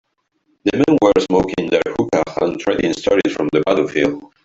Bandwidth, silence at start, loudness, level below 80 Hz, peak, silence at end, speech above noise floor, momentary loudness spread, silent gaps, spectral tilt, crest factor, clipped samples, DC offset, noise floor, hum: 8 kHz; 0.65 s; -17 LUFS; -48 dBFS; 0 dBFS; 0.2 s; 48 dB; 6 LU; none; -5.5 dB/octave; 16 dB; under 0.1%; under 0.1%; -65 dBFS; none